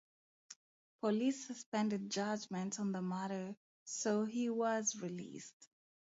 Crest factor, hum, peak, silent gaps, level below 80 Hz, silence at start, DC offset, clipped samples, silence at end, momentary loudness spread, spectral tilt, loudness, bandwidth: 16 dB; none; -24 dBFS; 0.56-0.99 s, 1.66-1.72 s, 3.57-3.86 s, 5.53-5.60 s; -86 dBFS; 0.5 s; under 0.1%; under 0.1%; 0.5 s; 18 LU; -5 dB/octave; -39 LUFS; 7.6 kHz